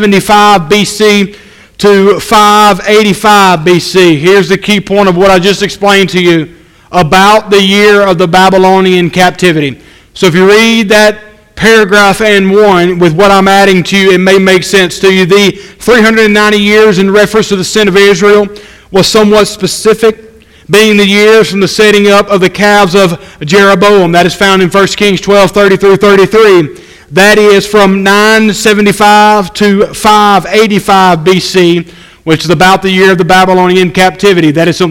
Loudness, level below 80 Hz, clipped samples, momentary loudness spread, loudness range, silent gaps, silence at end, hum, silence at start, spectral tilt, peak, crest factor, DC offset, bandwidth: -5 LUFS; -36 dBFS; 7%; 5 LU; 2 LU; none; 0 s; none; 0 s; -4.5 dB/octave; 0 dBFS; 6 dB; under 0.1%; 17 kHz